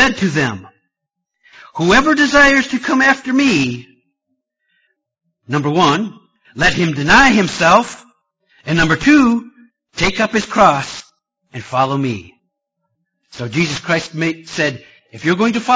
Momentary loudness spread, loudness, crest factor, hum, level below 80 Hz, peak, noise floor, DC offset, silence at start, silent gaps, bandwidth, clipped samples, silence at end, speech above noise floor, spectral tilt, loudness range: 17 LU; -14 LUFS; 16 dB; none; -40 dBFS; 0 dBFS; -78 dBFS; under 0.1%; 0 s; none; 8 kHz; under 0.1%; 0 s; 64 dB; -4.5 dB/octave; 7 LU